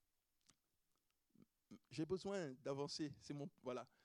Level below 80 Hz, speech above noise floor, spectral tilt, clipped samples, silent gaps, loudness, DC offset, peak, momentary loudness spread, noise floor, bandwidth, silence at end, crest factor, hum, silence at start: -82 dBFS; 39 dB; -5.5 dB/octave; under 0.1%; none; -49 LUFS; under 0.1%; -32 dBFS; 9 LU; -87 dBFS; 11.5 kHz; 0.2 s; 18 dB; none; 1.7 s